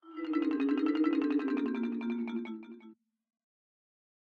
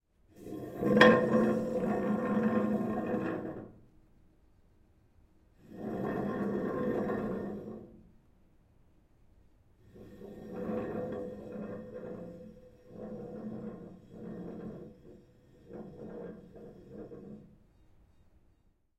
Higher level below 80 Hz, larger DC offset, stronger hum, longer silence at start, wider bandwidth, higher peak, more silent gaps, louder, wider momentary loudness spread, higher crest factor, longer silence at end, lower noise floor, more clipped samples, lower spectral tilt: second, -80 dBFS vs -62 dBFS; neither; neither; second, 0.05 s vs 0.35 s; second, 5 kHz vs 14 kHz; second, -18 dBFS vs -4 dBFS; neither; about the same, -32 LUFS vs -33 LUFS; second, 15 LU vs 22 LU; second, 16 dB vs 32 dB; second, 1.35 s vs 1.5 s; second, -58 dBFS vs -69 dBFS; neither; about the same, -7 dB/octave vs -7 dB/octave